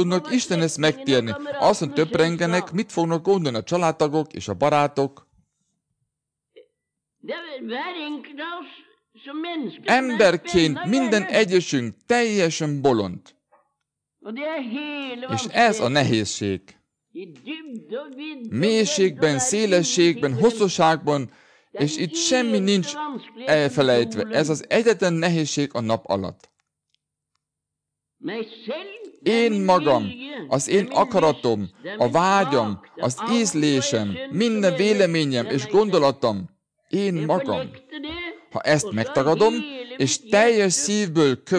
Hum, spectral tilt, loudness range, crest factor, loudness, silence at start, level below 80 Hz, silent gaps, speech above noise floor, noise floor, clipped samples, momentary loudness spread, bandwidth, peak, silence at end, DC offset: none; -4.5 dB/octave; 7 LU; 16 dB; -21 LUFS; 0 s; -60 dBFS; none; 63 dB; -84 dBFS; under 0.1%; 14 LU; 10.5 kHz; -6 dBFS; 0 s; under 0.1%